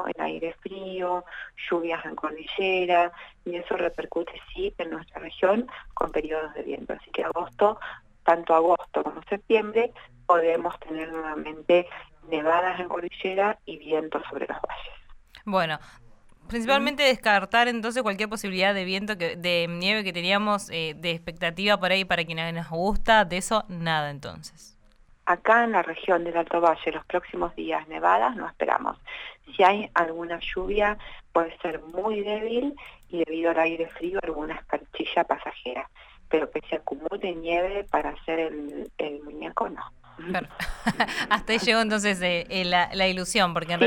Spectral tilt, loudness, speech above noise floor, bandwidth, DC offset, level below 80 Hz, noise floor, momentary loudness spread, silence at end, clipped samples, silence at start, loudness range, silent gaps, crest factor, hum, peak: -4 dB/octave; -26 LUFS; 30 dB; 16 kHz; under 0.1%; -48 dBFS; -56 dBFS; 13 LU; 0 s; under 0.1%; 0 s; 6 LU; none; 20 dB; none; -6 dBFS